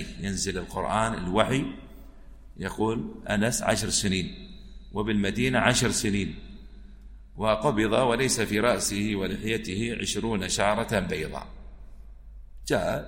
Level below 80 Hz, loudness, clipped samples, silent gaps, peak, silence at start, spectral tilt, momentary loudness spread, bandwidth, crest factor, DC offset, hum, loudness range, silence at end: -44 dBFS; -27 LUFS; under 0.1%; none; -4 dBFS; 0 s; -4 dB/octave; 13 LU; 16.5 kHz; 22 dB; under 0.1%; none; 3 LU; 0 s